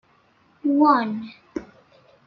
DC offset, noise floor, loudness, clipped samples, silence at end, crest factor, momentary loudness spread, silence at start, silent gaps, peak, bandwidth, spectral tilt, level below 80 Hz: under 0.1%; -60 dBFS; -21 LUFS; under 0.1%; 0.6 s; 18 dB; 19 LU; 0.65 s; none; -6 dBFS; 6 kHz; -7.5 dB/octave; -64 dBFS